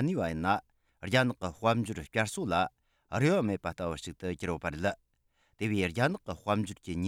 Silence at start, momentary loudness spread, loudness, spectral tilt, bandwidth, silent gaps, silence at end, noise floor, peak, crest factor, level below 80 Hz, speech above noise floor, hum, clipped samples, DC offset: 0 s; 9 LU; -32 LUFS; -6 dB/octave; 16 kHz; none; 0 s; -73 dBFS; -12 dBFS; 20 dB; -58 dBFS; 42 dB; none; under 0.1%; under 0.1%